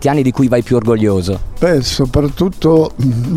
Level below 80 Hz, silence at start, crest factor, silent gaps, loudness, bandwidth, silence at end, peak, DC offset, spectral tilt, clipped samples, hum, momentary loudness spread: -30 dBFS; 0 s; 12 dB; none; -14 LUFS; 15.5 kHz; 0 s; 0 dBFS; under 0.1%; -6.5 dB/octave; under 0.1%; none; 4 LU